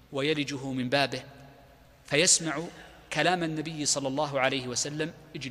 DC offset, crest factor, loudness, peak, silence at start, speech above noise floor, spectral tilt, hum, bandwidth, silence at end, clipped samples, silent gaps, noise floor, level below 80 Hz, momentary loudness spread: under 0.1%; 20 dB; -27 LUFS; -8 dBFS; 0.1 s; 27 dB; -2.5 dB/octave; none; 15.5 kHz; 0 s; under 0.1%; none; -55 dBFS; -62 dBFS; 13 LU